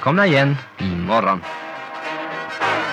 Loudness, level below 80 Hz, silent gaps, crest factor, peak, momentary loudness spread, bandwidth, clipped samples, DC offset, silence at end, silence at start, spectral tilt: -20 LUFS; -54 dBFS; none; 16 dB; -4 dBFS; 14 LU; 9.8 kHz; under 0.1%; under 0.1%; 0 s; 0 s; -6.5 dB/octave